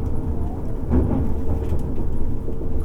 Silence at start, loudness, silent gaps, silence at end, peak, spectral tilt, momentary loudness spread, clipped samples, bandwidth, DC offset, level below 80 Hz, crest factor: 0 s; -25 LUFS; none; 0 s; -6 dBFS; -10 dB/octave; 7 LU; under 0.1%; 2.6 kHz; under 0.1%; -24 dBFS; 12 dB